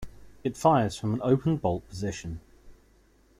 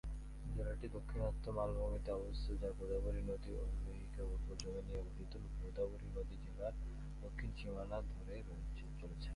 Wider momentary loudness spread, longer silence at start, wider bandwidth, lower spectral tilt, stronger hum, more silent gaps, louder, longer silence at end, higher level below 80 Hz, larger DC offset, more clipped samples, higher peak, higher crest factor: first, 14 LU vs 8 LU; about the same, 0 s vs 0.05 s; first, 15 kHz vs 11.5 kHz; about the same, -7 dB/octave vs -7 dB/octave; neither; neither; first, -27 LUFS vs -46 LUFS; first, 0.65 s vs 0 s; second, -52 dBFS vs -46 dBFS; neither; neither; first, -8 dBFS vs -28 dBFS; about the same, 20 dB vs 16 dB